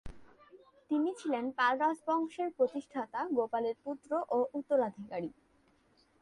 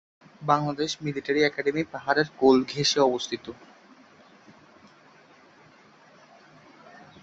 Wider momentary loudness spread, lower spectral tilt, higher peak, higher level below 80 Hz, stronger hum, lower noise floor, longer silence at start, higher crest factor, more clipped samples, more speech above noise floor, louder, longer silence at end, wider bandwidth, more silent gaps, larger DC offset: second, 9 LU vs 12 LU; first, -5.5 dB/octave vs -4 dB/octave; second, -18 dBFS vs -6 dBFS; about the same, -64 dBFS vs -64 dBFS; neither; first, -69 dBFS vs -55 dBFS; second, 0.05 s vs 0.4 s; about the same, 18 dB vs 22 dB; neither; first, 36 dB vs 30 dB; second, -34 LUFS vs -25 LUFS; second, 0.95 s vs 3.7 s; first, 11.5 kHz vs 8.2 kHz; neither; neither